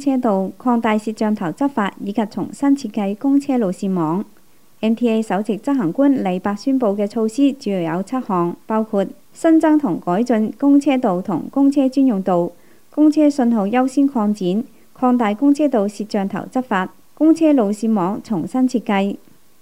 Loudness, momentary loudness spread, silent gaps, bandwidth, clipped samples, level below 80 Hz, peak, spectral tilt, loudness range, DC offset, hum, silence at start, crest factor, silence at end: -18 LUFS; 8 LU; none; 13.5 kHz; under 0.1%; -66 dBFS; -4 dBFS; -7 dB/octave; 3 LU; 0.5%; none; 0 s; 14 dB; 0.45 s